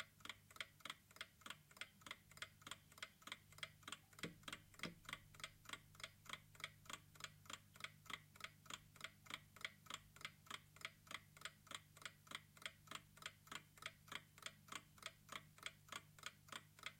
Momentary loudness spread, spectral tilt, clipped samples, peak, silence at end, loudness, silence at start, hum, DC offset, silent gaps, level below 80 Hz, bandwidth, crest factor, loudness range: 4 LU; -1.5 dB/octave; under 0.1%; -30 dBFS; 0 s; -56 LUFS; 0 s; none; under 0.1%; none; -80 dBFS; 16.5 kHz; 28 dB; 1 LU